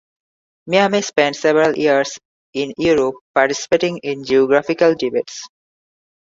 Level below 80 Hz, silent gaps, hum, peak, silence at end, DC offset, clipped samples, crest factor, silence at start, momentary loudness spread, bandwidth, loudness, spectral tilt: -56 dBFS; 2.25-2.53 s, 3.21-3.34 s; none; -2 dBFS; 0.85 s; under 0.1%; under 0.1%; 16 dB; 0.65 s; 10 LU; 7.8 kHz; -17 LUFS; -4 dB/octave